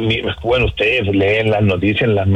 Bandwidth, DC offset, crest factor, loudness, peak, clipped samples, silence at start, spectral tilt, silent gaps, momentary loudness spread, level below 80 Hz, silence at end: 8.2 kHz; under 0.1%; 10 dB; -15 LUFS; -4 dBFS; under 0.1%; 0 s; -7.5 dB/octave; none; 3 LU; -34 dBFS; 0 s